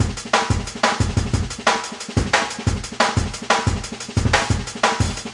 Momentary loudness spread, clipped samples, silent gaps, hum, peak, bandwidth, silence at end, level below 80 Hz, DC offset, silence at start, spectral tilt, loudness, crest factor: 5 LU; under 0.1%; none; none; -2 dBFS; 11.5 kHz; 0 s; -32 dBFS; under 0.1%; 0 s; -4 dB/octave; -21 LUFS; 18 dB